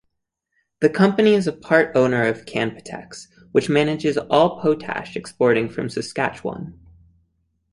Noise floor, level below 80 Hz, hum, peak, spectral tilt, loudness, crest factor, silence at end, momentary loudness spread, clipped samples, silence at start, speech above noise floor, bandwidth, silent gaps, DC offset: -76 dBFS; -58 dBFS; none; -2 dBFS; -6 dB/octave; -20 LUFS; 20 dB; 1 s; 18 LU; under 0.1%; 0.8 s; 56 dB; 11.5 kHz; none; under 0.1%